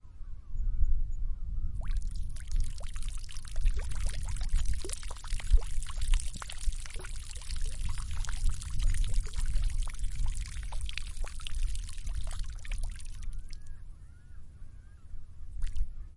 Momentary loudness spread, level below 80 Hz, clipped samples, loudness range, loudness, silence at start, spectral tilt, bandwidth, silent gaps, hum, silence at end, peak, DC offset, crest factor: 15 LU; -32 dBFS; under 0.1%; 8 LU; -39 LUFS; 0.05 s; -3.5 dB/octave; 11.5 kHz; none; none; 0.05 s; -10 dBFS; under 0.1%; 20 dB